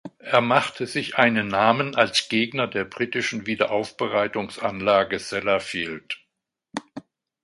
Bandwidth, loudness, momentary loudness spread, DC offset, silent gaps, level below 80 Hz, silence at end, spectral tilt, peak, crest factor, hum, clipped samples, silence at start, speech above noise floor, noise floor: 11.5 kHz; -23 LUFS; 15 LU; under 0.1%; none; -60 dBFS; 0.45 s; -4 dB/octave; -2 dBFS; 22 dB; none; under 0.1%; 0.05 s; 56 dB; -79 dBFS